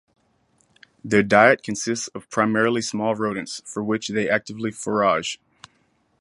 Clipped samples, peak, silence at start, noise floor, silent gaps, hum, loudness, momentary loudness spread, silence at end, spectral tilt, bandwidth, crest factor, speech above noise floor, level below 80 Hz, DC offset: under 0.1%; 0 dBFS; 1.05 s; -65 dBFS; none; none; -22 LUFS; 14 LU; 0.85 s; -4 dB/octave; 11.5 kHz; 22 dB; 44 dB; -60 dBFS; under 0.1%